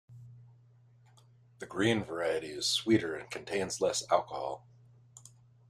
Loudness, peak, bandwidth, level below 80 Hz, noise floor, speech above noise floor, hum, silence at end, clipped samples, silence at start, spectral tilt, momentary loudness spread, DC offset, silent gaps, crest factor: -32 LUFS; -12 dBFS; 14.5 kHz; -70 dBFS; -61 dBFS; 29 dB; none; 0.5 s; under 0.1%; 0.1 s; -3.5 dB/octave; 16 LU; under 0.1%; none; 22 dB